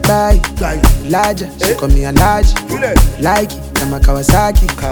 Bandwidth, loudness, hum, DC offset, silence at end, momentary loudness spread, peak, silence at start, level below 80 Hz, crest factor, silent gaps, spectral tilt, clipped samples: over 20 kHz; -13 LUFS; none; under 0.1%; 0 s; 6 LU; 0 dBFS; 0 s; -14 dBFS; 10 dB; none; -5 dB/octave; under 0.1%